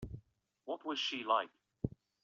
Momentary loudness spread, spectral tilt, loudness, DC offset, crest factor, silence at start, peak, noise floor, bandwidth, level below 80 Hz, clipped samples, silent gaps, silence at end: 17 LU; -2.5 dB/octave; -38 LUFS; under 0.1%; 20 dB; 0 s; -20 dBFS; -66 dBFS; 7.6 kHz; -62 dBFS; under 0.1%; none; 0.35 s